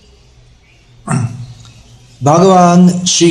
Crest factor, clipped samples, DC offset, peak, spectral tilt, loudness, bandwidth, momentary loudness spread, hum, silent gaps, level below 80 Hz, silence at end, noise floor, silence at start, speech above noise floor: 12 dB; under 0.1%; under 0.1%; 0 dBFS; -5 dB/octave; -10 LUFS; 11 kHz; 24 LU; none; none; -46 dBFS; 0 s; -44 dBFS; 1.05 s; 37 dB